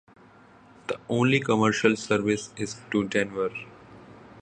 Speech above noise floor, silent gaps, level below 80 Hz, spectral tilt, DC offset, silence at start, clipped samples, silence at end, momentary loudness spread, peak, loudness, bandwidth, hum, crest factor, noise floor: 28 dB; none; -62 dBFS; -5 dB/octave; under 0.1%; 0.9 s; under 0.1%; 0 s; 13 LU; -4 dBFS; -26 LUFS; 9.8 kHz; none; 22 dB; -53 dBFS